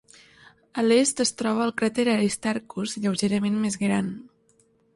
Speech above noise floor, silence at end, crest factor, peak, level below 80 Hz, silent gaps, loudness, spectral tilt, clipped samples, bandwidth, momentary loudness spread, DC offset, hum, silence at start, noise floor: 39 dB; 0.7 s; 18 dB; -8 dBFS; -64 dBFS; none; -24 LUFS; -4.5 dB/octave; under 0.1%; 11.5 kHz; 10 LU; under 0.1%; none; 0.75 s; -63 dBFS